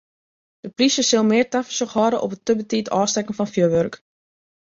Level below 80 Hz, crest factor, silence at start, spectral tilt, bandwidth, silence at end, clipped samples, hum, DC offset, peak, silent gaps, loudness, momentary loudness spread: -60 dBFS; 16 dB; 0.65 s; -4 dB/octave; 7.8 kHz; 0.75 s; under 0.1%; none; under 0.1%; -6 dBFS; none; -20 LUFS; 7 LU